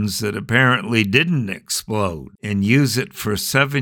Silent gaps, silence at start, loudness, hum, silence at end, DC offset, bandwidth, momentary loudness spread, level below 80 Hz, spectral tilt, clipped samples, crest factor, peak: none; 0 s; -18 LUFS; none; 0 s; under 0.1%; 19 kHz; 8 LU; -50 dBFS; -4.5 dB/octave; under 0.1%; 18 dB; 0 dBFS